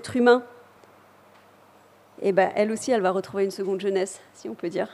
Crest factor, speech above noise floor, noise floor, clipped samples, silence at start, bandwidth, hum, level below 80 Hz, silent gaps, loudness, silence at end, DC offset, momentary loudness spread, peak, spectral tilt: 20 dB; 31 dB; -55 dBFS; under 0.1%; 0 s; 13 kHz; none; -72 dBFS; none; -24 LUFS; 0 s; under 0.1%; 13 LU; -6 dBFS; -5 dB/octave